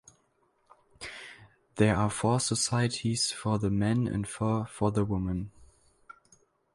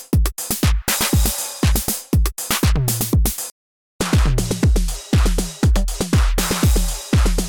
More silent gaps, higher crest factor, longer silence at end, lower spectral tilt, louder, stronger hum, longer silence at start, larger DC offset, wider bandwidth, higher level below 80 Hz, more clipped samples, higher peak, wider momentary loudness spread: second, none vs 3.51-3.99 s; first, 20 dB vs 10 dB; first, 1.1 s vs 0 s; about the same, -5 dB/octave vs -4.5 dB/octave; second, -29 LUFS vs -19 LUFS; neither; first, 1 s vs 0 s; neither; second, 11.5 kHz vs over 20 kHz; second, -52 dBFS vs -20 dBFS; neither; about the same, -10 dBFS vs -8 dBFS; first, 17 LU vs 4 LU